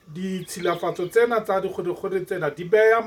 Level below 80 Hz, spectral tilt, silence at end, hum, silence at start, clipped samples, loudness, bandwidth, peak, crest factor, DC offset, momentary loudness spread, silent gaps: -64 dBFS; -5.5 dB/octave; 0 s; none; 0.1 s; under 0.1%; -24 LUFS; 16.5 kHz; -6 dBFS; 16 dB; under 0.1%; 10 LU; none